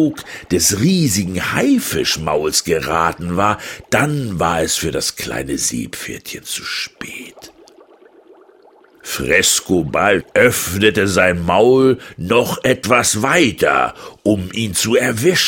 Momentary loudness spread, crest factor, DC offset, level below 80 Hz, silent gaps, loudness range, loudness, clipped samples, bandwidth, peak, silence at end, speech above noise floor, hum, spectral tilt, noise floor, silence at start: 11 LU; 16 dB; under 0.1%; -44 dBFS; none; 10 LU; -16 LUFS; under 0.1%; 17 kHz; 0 dBFS; 0 s; 32 dB; none; -3.5 dB/octave; -48 dBFS; 0 s